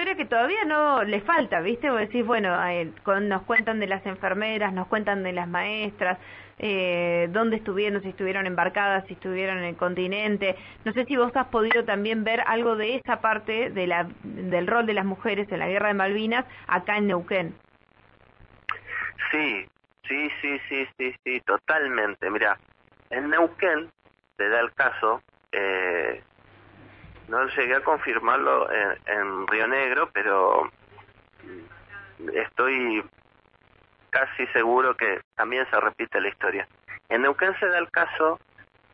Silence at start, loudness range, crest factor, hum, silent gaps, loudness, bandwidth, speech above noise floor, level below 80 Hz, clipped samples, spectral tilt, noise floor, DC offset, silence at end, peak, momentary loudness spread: 0 s; 4 LU; 20 dB; none; 35.24-35.31 s; -25 LUFS; 5.8 kHz; 35 dB; -62 dBFS; under 0.1%; -8.5 dB/octave; -60 dBFS; under 0.1%; 0.3 s; -6 dBFS; 9 LU